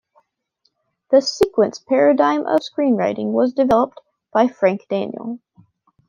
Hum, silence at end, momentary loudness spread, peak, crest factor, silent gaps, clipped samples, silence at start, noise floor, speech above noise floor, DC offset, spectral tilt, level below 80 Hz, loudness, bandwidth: none; 0.7 s; 9 LU; -2 dBFS; 16 dB; none; under 0.1%; 1.1 s; -68 dBFS; 51 dB; under 0.1%; -5.5 dB/octave; -56 dBFS; -18 LUFS; 11 kHz